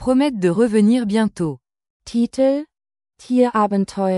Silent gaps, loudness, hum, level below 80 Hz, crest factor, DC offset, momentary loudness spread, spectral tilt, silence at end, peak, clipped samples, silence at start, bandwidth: 1.90-2.00 s; -18 LUFS; none; -52 dBFS; 14 dB; under 0.1%; 10 LU; -7 dB/octave; 0 s; -4 dBFS; under 0.1%; 0 s; 11.5 kHz